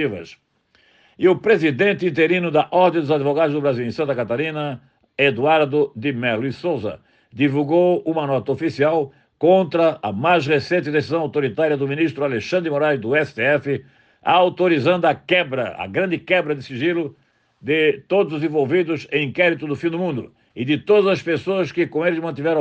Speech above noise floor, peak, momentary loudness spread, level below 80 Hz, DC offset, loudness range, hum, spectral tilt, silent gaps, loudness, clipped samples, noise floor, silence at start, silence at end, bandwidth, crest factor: 40 dB; -2 dBFS; 8 LU; -64 dBFS; under 0.1%; 2 LU; none; -7 dB/octave; none; -19 LUFS; under 0.1%; -59 dBFS; 0 s; 0 s; 8.2 kHz; 16 dB